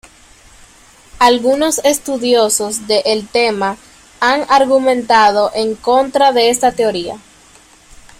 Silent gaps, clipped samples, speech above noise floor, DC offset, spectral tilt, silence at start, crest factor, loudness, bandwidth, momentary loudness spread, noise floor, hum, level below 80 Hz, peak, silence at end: none; under 0.1%; 32 dB; under 0.1%; -2 dB/octave; 1.15 s; 14 dB; -13 LUFS; 16 kHz; 7 LU; -45 dBFS; none; -48 dBFS; 0 dBFS; 1 s